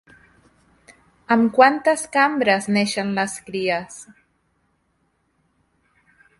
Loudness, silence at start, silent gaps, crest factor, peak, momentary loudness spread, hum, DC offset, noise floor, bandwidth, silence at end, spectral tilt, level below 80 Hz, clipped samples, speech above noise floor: -19 LUFS; 1.3 s; none; 22 dB; 0 dBFS; 11 LU; none; under 0.1%; -68 dBFS; 11.5 kHz; 2.35 s; -4 dB/octave; -64 dBFS; under 0.1%; 48 dB